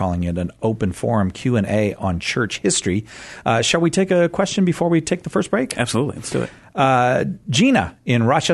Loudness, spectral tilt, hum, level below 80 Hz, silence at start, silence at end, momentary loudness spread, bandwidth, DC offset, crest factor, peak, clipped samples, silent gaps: -19 LUFS; -5 dB/octave; none; -46 dBFS; 0 s; 0 s; 7 LU; 12.5 kHz; under 0.1%; 16 dB; -2 dBFS; under 0.1%; none